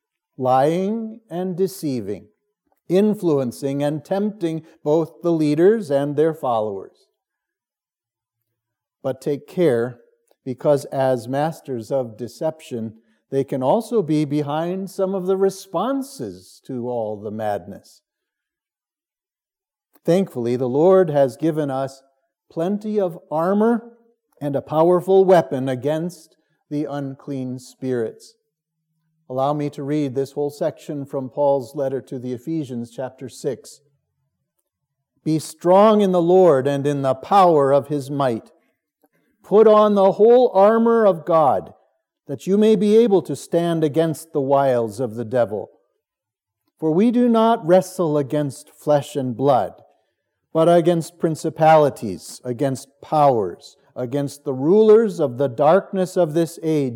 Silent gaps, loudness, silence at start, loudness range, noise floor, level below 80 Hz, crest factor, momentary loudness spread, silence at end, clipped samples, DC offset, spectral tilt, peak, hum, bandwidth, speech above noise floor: none; -19 LUFS; 0.4 s; 11 LU; under -90 dBFS; -76 dBFS; 16 dB; 15 LU; 0 s; under 0.1%; under 0.1%; -7 dB/octave; -2 dBFS; none; 16.5 kHz; over 71 dB